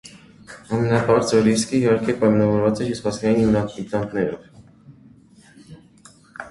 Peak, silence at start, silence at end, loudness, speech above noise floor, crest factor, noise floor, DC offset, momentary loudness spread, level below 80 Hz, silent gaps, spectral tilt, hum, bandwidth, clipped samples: -4 dBFS; 0.05 s; 0 s; -20 LUFS; 31 dB; 18 dB; -50 dBFS; under 0.1%; 9 LU; -50 dBFS; none; -6 dB/octave; none; 11.5 kHz; under 0.1%